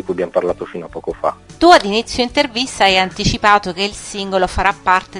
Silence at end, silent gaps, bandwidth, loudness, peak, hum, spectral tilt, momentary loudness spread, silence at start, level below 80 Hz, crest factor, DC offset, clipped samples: 0 s; none; 12 kHz; -15 LUFS; 0 dBFS; none; -3.5 dB/octave; 13 LU; 0.05 s; -36 dBFS; 16 dB; under 0.1%; 0.3%